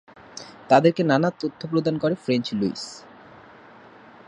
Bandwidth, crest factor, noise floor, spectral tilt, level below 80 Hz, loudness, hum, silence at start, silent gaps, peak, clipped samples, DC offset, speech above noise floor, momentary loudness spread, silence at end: 10.5 kHz; 22 dB; -48 dBFS; -6.5 dB/octave; -66 dBFS; -22 LUFS; none; 0.35 s; none; -2 dBFS; under 0.1%; under 0.1%; 26 dB; 22 LU; 1.25 s